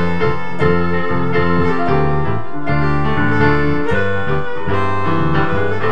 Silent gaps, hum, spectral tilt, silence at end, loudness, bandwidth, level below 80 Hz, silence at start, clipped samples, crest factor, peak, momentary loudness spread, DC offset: none; none; -8.5 dB/octave; 0 s; -17 LUFS; 8.2 kHz; -34 dBFS; 0 s; under 0.1%; 16 dB; 0 dBFS; 6 LU; 20%